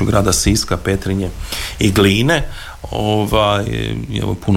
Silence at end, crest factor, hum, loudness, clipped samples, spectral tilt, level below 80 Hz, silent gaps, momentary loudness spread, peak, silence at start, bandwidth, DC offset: 0 s; 16 dB; none; -16 LUFS; under 0.1%; -4.5 dB/octave; -28 dBFS; none; 11 LU; 0 dBFS; 0 s; 16.5 kHz; under 0.1%